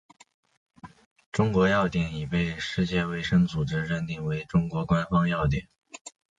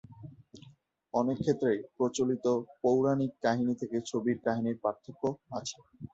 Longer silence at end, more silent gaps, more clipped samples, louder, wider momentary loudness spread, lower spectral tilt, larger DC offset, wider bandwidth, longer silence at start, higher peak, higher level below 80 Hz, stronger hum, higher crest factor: first, 0.3 s vs 0.05 s; first, 1.06-1.16 s, 1.26-1.32 s, 6.01-6.05 s vs none; neither; first, -26 LUFS vs -31 LUFS; about the same, 10 LU vs 10 LU; about the same, -7 dB/octave vs -6 dB/octave; neither; first, 9.2 kHz vs 8 kHz; first, 0.85 s vs 0.1 s; first, -10 dBFS vs -14 dBFS; first, -44 dBFS vs -68 dBFS; neither; about the same, 16 dB vs 18 dB